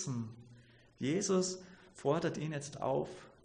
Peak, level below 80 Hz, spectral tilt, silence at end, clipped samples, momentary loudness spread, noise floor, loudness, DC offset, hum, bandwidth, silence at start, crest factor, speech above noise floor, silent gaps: -20 dBFS; -70 dBFS; -5 dB/octave; 0.15 s; under 0.1%; 15 LU; -61 dBFS; -36 LUFS; under 0.1%; none; 10 kHz; 0 s; 18 dB; 25 dB; none